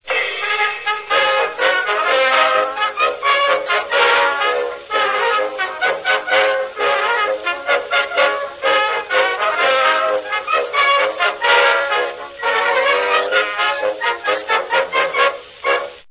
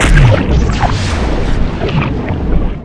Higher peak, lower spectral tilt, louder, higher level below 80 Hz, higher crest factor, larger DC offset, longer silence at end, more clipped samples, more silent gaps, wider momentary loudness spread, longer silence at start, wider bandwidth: about the same, -2 dBFS vs 0 dBFS; second, -4 dB/octave vs -6 dB/octave; about the same, -16 LUFS vs -14 LUFS; second, -60 dBFS vs -14 dBFS; first, 16 dB vs 10 dB; neither; about the same, 0.1 s vs 0 s; second, under 0.1% vs 0.9%; neither; about the same, 6 LU vs 8 LU; about the same, 0.05 s vs 0 s; second, 4 kHz vs 10.5 kHz